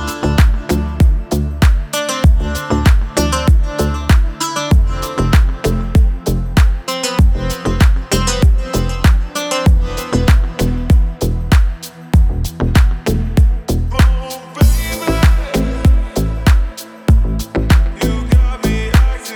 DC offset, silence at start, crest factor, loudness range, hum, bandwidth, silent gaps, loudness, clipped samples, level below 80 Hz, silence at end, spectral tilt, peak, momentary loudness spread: under 0.1%; 0 s; 12 dB; 1 LU; none; 19 kHz; none; -15 LUFS; under 0.1%; -14 dBFS; 0 s; -5.5 dB/octave; 0 dBFS; 5 LU